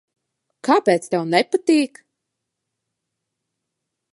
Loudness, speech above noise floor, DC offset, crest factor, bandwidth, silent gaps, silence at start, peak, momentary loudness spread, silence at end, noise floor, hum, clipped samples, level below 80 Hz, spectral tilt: -19 LUFS; 62 dB; under 0.1%; 22 dB; 11.5 kHz; none; 0.65 s; -2 dBFS; 7 LU; 2.25 s; -80 dBFS; none; under 0.1%; -78 dBFS; -5 dB/octave